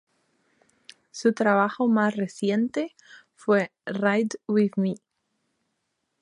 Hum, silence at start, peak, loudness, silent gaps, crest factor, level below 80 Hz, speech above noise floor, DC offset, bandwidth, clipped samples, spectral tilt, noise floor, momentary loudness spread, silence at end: none; 1.15 s; -8 dBFS; -25 LUFS; none; 20 dB; -76 dBFS; 54 dB; under 0.1%; 10.5 kHz; under 0.1%; -6.5 dB/octave; -77 dBFS; 10 LU; 1.25 s